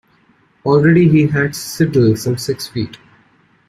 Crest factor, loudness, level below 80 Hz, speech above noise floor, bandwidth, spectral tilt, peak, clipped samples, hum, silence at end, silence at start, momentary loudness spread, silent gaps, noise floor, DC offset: 14 dB; -15 LUFS; -48 dBFS; 41 dB; 15 kHz; -6.5 dB/octave; -2 dBFS; under 0.1%; none; 0.75 s; 0.65 s; 13 LU; none; -54 dBFS; under 0.1%